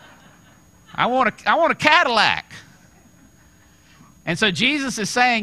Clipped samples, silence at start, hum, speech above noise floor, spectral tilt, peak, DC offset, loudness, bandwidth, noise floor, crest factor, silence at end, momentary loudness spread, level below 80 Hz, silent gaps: under 0.1%; 0.95 s; none; 34 dB; -3 dB/octave; 0 dBFS; under 0.1%; -18 LUFS; 15 kHz; -52 dBFS; 22 dB; 0 s; 13 LU; -58 dBFS; none